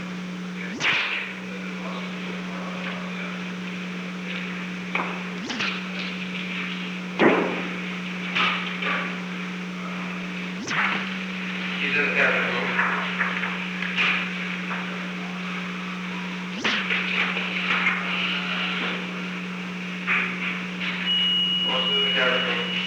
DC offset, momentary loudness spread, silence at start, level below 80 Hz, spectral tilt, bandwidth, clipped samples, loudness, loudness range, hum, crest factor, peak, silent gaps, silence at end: under 0.1%; 11 LU; 0 s; -66 dBFS; -4.5 dB/octave; 10 kHz; under 0.1%; -25 LUFS; 6 LU; none; 22 dB; -4 dBFS; none; 0 s